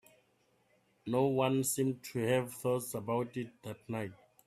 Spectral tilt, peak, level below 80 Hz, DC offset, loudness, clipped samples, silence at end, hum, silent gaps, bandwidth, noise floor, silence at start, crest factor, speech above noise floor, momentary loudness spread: -5.5 dB/octave; -18 dBFS; -74 dBFS; under 0.1%; -34 LUFS; under 0.1%; 0.3 s; none; none; 16 kHz; -73 dBFS; 1.05 s; 18 dB; 39 dB; 14 LU